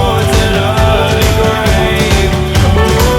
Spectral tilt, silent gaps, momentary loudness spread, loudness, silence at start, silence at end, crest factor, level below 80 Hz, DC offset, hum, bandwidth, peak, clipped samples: -5 dB/octave; none; 2 LU; -10 LUFS; 0 s; 0 s; 10 dB; -16 dBFS; under 0.1%; none; 17.5 kHz; 0 dBFS; under 0.1%